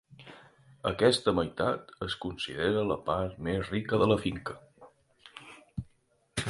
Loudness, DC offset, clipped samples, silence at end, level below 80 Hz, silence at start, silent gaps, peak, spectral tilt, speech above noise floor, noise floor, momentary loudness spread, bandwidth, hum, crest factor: -30 LUFS; under 0.1%; under 0.1%; 0 s; -52 dBFS; 0.1 s; none; -10 dBFS; -5.5 dB/octave; 38 dB; -68 dBFS; 23 LU; 11.5 kHz; none; 22 dB